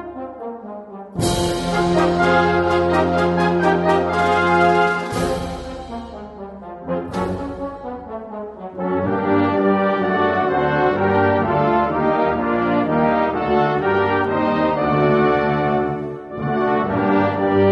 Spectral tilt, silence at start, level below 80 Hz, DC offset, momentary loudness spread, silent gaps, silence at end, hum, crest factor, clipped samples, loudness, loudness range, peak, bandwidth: -6.5 dB/octave; 0 s; -42 dBFS; under 0.1%; 15 LU; none; 0 s; none; 16 dB; under 0.1%; -18 LUFS; 8 LU; -2 dBFS; 12 kHz